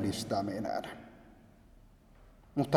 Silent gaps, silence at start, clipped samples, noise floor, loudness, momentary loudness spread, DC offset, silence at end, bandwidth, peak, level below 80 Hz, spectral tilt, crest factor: none; 0 s; under 0.1%; -59 dBFS; -36 LUFS; 23 LU; under 0.1%; 0 s; 18 kHz; -10 dBFS; -62 dBFS; -6 dB/octave; 26 dB